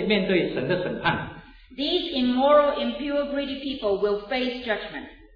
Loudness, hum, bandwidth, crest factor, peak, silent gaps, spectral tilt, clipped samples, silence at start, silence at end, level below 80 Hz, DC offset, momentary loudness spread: -24 LUFS; none; 5.2 kHz; 16 dB; -8 dBFS; none; -7.5 dB/octave; under 0.1%; 0 s; 0.1 s; -52 dBFS; under 0.1%; 11 LU